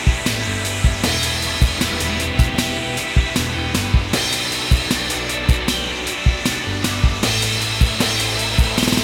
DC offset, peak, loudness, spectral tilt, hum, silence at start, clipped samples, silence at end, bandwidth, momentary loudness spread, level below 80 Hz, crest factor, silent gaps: under 0.1%; -2 dBFS; -19 LUFS; -3.5 dB/octave; none; 0 s; under 0.1%; 0 s; 17.5 kHz; 3 LU; -24 dBFS; 18 dB; none